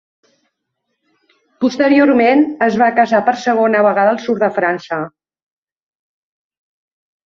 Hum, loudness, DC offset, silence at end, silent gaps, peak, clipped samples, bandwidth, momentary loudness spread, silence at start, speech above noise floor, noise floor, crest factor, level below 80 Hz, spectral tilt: none; -14 LUFS; under 0.1%; 2.2 s; none; -2 dBFS; under 0.1%; 7.4 kHz; 9 LU; 1.6 s; 60 dB; -73 dBFS; 14 dB; -62 dBFS; -6 dB/octave